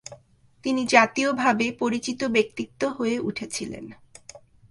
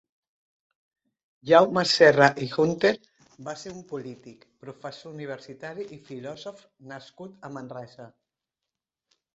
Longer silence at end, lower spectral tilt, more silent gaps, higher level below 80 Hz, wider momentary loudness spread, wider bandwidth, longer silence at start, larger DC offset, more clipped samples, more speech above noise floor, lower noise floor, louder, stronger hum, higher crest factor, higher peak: second, 0.35 s vs 1.3 s; about the same, -3.5 dB/octave vs -4.5 dB/octave; neither; first, -62 dBFS vs -68 dBFS; second, 16 LU vs 25 LU; first, 11.5 kHz vs 8.2 kHz; second, 0.1 s vs 1.45 s; neither; neither; second, 32 dB vs 62 dB; second, -56 dBFS vs -88 dBFS; second, -24 LUFS vs -20 LUFS; neither; about the same, 24 dB vs 24 dB; about the same, -2 dBFS vs -2 dBFS